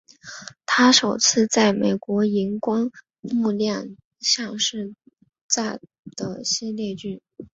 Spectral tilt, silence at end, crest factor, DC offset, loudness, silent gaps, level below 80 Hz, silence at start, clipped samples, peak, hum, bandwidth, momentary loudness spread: -3 dB/octave; 0.1 s; 20 dB; under 0.1%; -21 LUFS; 3.19-3.23 s, 4.05-4.11 s, 5.41-5.49 s, 5.99-6.03 s; -64 dBFS; 0.25 s; under 0.1%; -2 dBFS; none; 8 kHz; 21 LU